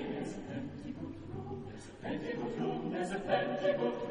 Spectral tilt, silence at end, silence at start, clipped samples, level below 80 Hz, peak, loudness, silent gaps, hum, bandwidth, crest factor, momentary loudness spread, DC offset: -6.5 dB/octave; 0 s; 0 s; under 0.1%; -58 dBFS; -18 dBFS; -37 LUFS; none; none; 10 kHz; 18 dB; 12 LU; under 0.1%